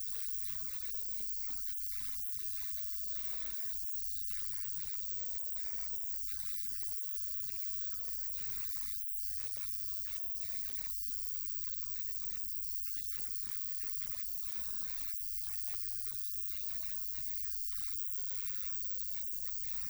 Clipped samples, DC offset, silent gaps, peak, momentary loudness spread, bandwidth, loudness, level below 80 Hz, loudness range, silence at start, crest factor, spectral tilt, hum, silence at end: under 0.1%; under 0.1%; none; -22 dBFS; 1 LU; over 20 kHz; -35 LUFS; -60 dBFS; 0 LU; 0 s; 18 dB; -0.5 dB/octave; none; 0 s